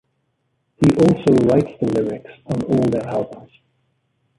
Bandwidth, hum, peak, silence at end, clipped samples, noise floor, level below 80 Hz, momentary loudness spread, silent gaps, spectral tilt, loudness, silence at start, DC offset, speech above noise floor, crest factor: 11.5 kHz; none; -2 dBFS; 0.95 s; under 0.1%; -69 dBFS; -48 dBFS; 12 LU; none; -8 dB/octave; -18 LUFS; 0.8 s; under 0.1%; 52 dB; 18 dB